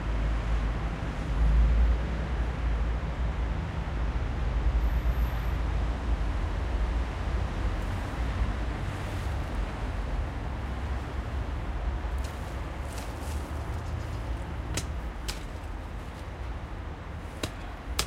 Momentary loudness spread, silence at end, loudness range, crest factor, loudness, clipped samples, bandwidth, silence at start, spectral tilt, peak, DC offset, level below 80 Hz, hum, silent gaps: 9 LU; 0 s; 6 LU; 24 dB; -33 LUFS; under 0.1%; 13.5 kHz; 0 s; -5.5 dB/octave; -6 dBFS; under 0.1%; -30 dBFS; none; none